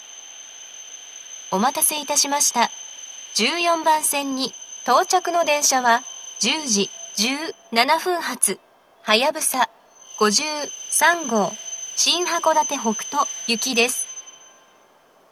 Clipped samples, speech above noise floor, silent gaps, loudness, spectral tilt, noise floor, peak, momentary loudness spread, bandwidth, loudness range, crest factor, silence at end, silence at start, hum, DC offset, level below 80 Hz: under 0.1%; 34 dB; none; -20 LUFS; -1 dB/octave; -55 dBFS; 0 dBFS; 17 LU; 16.5 kHz; 2 LU; 22 dB; 1 s; 0 s; none; under 0.1%; -84 dBFS